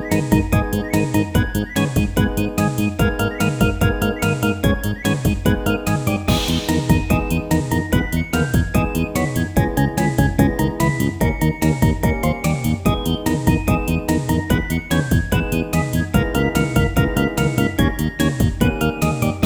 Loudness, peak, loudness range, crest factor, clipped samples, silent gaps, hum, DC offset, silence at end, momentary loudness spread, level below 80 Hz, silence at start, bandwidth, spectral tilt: -19 LUFS; -2 dBFS; 1 LU; 16 dB; under 0.1%; none; none; under 0.1%; 0 s; 2 LU; -28 dBFS; 0 s; over 20 kHz; -6 dB/octave